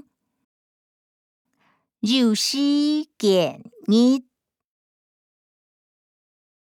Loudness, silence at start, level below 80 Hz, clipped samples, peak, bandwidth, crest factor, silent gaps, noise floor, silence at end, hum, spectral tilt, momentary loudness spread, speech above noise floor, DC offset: -20 LUFS; 2.05 s; -82 dBFS; under 0.1%; -8 dBFS; 17.5 kHz; 16 dB; none; -67 dBFS; 2.5 s; none; -4.5 dB/octave; 9 LU; 47 dB; under 0.1%